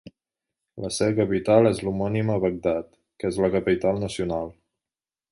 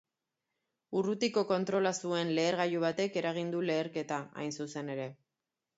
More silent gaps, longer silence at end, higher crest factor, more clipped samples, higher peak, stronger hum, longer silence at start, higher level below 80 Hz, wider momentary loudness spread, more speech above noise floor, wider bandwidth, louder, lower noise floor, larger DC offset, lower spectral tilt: neither; first, 0.8 s vs 0.65 s; about the same, 20 dB vs 18 dB; neither; first, -4 dBFS vs -16 dBFS; neither; second, 0.05 s vs 0.9 s; first, -50 dBFS vs -80 dBFS; first, 12 LU vs 9 LU; first, over 67 dB vs 56 dB; first, 11.5 kHz vs 8 kHz; first, -24 LUFS vs -33 LUFS; about the same, under -90 dBFS vs -89 dBFS; neither; first, -6.5 dB/octave vs -5 dB/octave